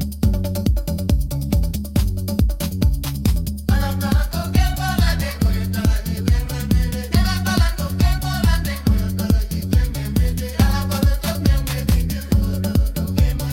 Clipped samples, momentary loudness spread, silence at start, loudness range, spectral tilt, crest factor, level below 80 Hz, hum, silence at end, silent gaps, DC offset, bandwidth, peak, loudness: under 0.1%; 3 LU; 0 s; 1 LU; -6 dB/octave; 18 dB; -22 dBFS; none; 0 s; none; under 0.1%; 17 kHz; 0 dBFS; -20 LUFS